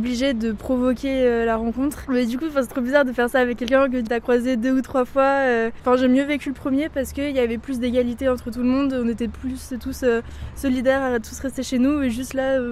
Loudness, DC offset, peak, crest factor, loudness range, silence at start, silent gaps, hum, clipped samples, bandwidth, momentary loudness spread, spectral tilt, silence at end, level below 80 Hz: -22 LUFS; under 0.1%; -2 dBFS; 18 dB; 3 LU; 0 s; none; none; under 0.1%; 14.5 kHz; 7 LU; -5.5 dB/octave; 0 s; -42 dBFS